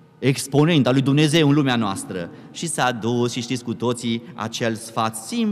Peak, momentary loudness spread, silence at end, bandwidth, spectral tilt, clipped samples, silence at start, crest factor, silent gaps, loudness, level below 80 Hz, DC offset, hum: -6 dBFS; 12 LU; 0 s; 15 kHz; -5 dB/octave; under 0.1%; 0.2 s; 14 dB; none; -21 LUFS; -62 dBFS; under 0.1%; none